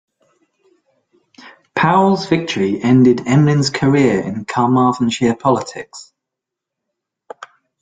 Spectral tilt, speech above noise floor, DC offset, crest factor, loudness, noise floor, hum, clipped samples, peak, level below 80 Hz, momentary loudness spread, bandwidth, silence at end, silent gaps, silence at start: -6.5 dB/octave; 68 dB; under 0.1%; 16 dB; -15 LUFS; -82 dBFS; none; under 0.1%; -2 dBFS; -54 dBFS; 20 LU; 9.4 kHz; 0.35 s; none; 1.45 s